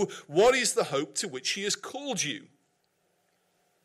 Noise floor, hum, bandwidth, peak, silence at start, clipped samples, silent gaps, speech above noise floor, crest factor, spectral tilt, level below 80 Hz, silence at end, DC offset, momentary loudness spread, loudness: -73 dBFS; none; 16 kHz; -14 dBFS; 0 s; under 0.1%; none; 45 dB; 16 dB; -2.5 dB/octave; -66 dBFS; 1.4 s; under 0.1%; 10 LU; -27 LUFS